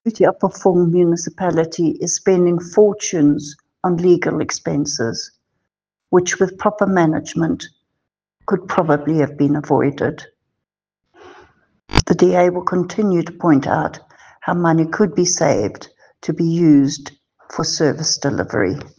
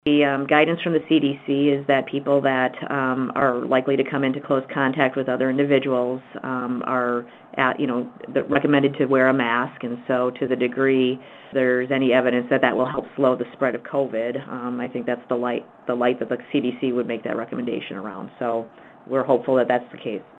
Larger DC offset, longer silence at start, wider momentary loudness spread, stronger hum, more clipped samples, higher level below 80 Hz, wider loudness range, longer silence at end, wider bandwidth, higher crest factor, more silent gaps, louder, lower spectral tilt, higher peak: neither; about the same, 0.05 s vs 0.05 s; about the same, 9 LU vs 10 LU; neither; neither; first, -42 dBFS vs -66 dBFS; about the same, 3 LU vs 4 LU; about the same, 0.1 s vs 0.15 s; first, 10 kHz vs 4.1 kHz; about the same, 18 dB vs 20 dB; neither; first, -17 LUFS vs -22 LUFS; second, -5 dB/octave vs -8 dB/octave; about the same, 0 dBFS vs 0 dBFS